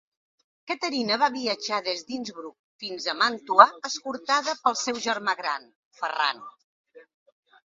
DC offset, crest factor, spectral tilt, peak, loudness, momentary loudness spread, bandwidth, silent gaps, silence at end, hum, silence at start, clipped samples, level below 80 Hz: under 0.1%; 26 dB; -1.5 dB/octave; 0 dBFS; -25 LUFS; 16 LU; 7.8 kHz; 2.59-2.79 s, 5.75-5.91 s, 6.64-6.84 s; 0.65 s; none; 0.65 s; under 0.1%; -76 dBFS